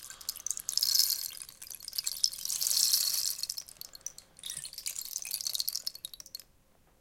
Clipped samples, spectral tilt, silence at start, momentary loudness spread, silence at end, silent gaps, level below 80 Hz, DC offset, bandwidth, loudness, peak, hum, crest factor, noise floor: under 0.1%; 3.5 dB/octave; 0 s; 19 LU; 0.6 s; none; -68 dBFS; under 0.1%; 17 kHz; -30 LUFS; -6 dBFS; none; 30 dB; -65 dBFS